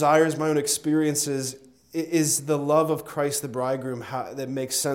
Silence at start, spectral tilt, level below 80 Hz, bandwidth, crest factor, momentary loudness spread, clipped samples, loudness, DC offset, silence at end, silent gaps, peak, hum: 0 s; -4 dB/octave; -68 dBFS; 17 kHz; 18 dB; 10 LU; under 0.1%; -25 LUFS; under 0.1%; 0 s; none; -8 dBFS; none